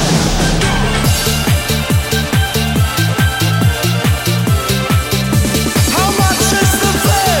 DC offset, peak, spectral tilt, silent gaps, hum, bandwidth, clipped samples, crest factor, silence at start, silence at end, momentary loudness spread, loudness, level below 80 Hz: under 0.1%; 0 dBFS; -4 dB/octave; none; none; 17 kHz; under 0.1%; 12 dB; 0 s; 0 s; 3 LU; -13 LUFS; -22 dBFS